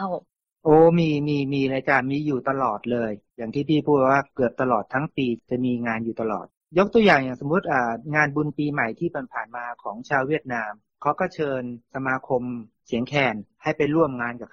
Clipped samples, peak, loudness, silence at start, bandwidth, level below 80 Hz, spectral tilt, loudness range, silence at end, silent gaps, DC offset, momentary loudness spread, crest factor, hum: under 0.1%; -4 dBFS; -23 LUFS; 0 s; 7.2 kHz; -58 dBFS; -7.5 dB/octave; 5 LU; 0.05 s; 6.57-6.61 s; under 0.1%; 12 LU; 20 dB; none